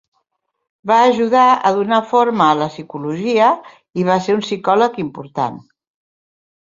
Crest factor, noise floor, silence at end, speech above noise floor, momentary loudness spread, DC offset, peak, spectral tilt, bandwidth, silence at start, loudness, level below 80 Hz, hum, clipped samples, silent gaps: 16 dB; -70 dBFS; 1.05 s; 55 dB; 12 LU; under 0.1%; -2 dBFS; -5.5 dB/octave; 7.6 kHz; 0.85 s; -16 LUFS; -62 dBFS; none; under 0.1%; none